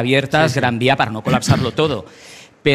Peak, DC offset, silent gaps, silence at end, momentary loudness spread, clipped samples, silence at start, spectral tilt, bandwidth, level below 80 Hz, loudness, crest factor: -2 dBFS; under 0.1%; none; 0 s; 6 LU; under 0.1%; 0 s; -5.5 dB/octave; 15 kHz; -44 dBFS; -17 LUFS; 16 dB